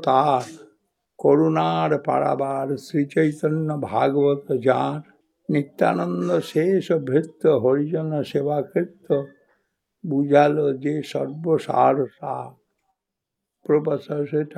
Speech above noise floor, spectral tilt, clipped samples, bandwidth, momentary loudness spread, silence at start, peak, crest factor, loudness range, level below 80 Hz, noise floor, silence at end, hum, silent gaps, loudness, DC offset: 62 dB; -7.5 dB/octave; under 0.1%; 13 kHz; 9 LU; 0 s; -2 dBFS; 20 dB; 2 LU; -76 dBFS; -83 dBFS; 0.05 s; none; none; -22 LUFS; under 0.1%